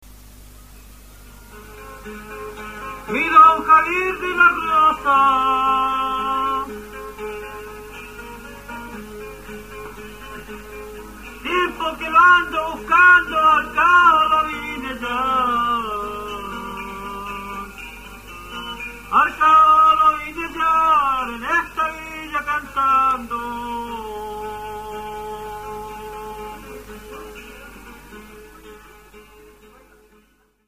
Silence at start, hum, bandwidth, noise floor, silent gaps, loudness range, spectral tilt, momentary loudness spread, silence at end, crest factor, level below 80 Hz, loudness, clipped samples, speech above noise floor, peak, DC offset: 0.05 s; 50 Hz at -45 dBFS; 15.5 kHz; -58 dBFS; none; 20 LU; -3.5 dB/octave; 24 LU; 1.45 s; 20 dB; -44 dBFS; -16 LUFS; under 0.1%; 42 dB; -2 dBFS; 0.1%